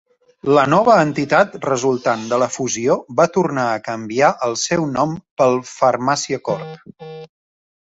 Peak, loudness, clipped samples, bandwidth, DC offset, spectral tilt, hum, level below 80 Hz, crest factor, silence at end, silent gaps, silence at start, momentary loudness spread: 0 dBFS; -17 LUFS; under 0.1%; 8 kHz; under 0.1%; -4.5 dB/octave; none; -58 dBFS; 18 dB; 0.7 s; 5.31-5.37 s; 0.45 s; 12 LU